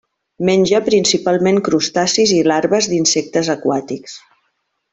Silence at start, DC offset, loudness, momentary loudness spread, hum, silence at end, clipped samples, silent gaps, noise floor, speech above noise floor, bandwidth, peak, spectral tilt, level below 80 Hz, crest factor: 0.4 s; under 0.1%; -15 LUFS; 8 LU; none; 0.75 s; under 0.1%; none; -68 dBFS; 53 dB; 8.4 kHz; -2 dBFS; -3.5 dB/octave; -56 dBFS; 14 dB